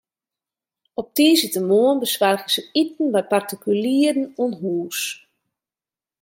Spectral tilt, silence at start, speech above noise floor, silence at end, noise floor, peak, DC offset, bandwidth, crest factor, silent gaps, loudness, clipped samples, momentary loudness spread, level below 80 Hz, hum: -3.5 dB/octave; 1 s; over 70 dB; 1.05 s; under -90 dBFS; -4 dBFS; under 0.1%; 17 kHz; 18 dB; none; -20 LUFS; under 0.1%; 10 LU; -74 dBFS; none